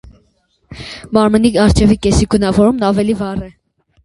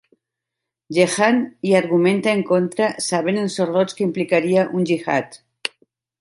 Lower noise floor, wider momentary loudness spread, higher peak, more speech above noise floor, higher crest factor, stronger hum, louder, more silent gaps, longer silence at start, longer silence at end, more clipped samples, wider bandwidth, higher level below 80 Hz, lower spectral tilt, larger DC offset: second, -59 dBFS vs -83 dBFS; first, 18 LU vs 8 LU; about the same, 0 dBFS vs -2 dBFS; second, 47 dB vs 65 dB; about the same, 14 dB vs 18 dB; neither; first, -13 LUFS vs -19 LUFS; neither; second, 0.7 s vs 0.9 s; about the same, 0.55 s vs 0.5 s; neither; about the same, 11.5 kHz vs 11.5 kHz; first, -28 dBFS vs -68 dBFS; about the same, -6 dB/octave vs -5 dB/octave; neither